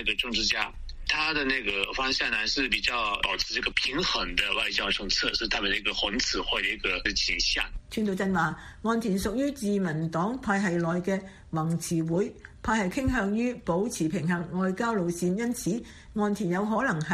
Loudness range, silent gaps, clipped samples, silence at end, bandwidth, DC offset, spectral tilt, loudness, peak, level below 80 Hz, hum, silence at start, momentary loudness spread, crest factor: 3 LU; none; under 0.1%; 0 s; 14.5 kHz; under 0.1%; -4 dB/octave; -27 LUFS; -8 dBFS; -44 dBFS; none; 0 s; 5 LU; 20 dB